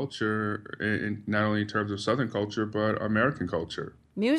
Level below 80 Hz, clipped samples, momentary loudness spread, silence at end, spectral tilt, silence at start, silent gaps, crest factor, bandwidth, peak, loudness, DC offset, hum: -60 dBFS; under 0.1%; 7 LU; 0 s; -6.5 dB/octave; 0 s; none; 18 dB; 10.5 kHz; -12 dBFS; -29 LUFS; under 0.1%; none